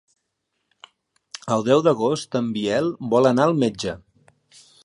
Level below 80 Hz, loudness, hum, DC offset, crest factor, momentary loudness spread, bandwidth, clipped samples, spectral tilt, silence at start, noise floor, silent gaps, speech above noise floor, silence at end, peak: -60 dBFS; -21 LUFS; none; under 0.1%; 20 dB; 13 LU; 11.5 kHz; under 0.1%; -6 dB/octave; 1.45 s; -76 dBFS; none; 56 dB; 0.9 s; -4 dBFS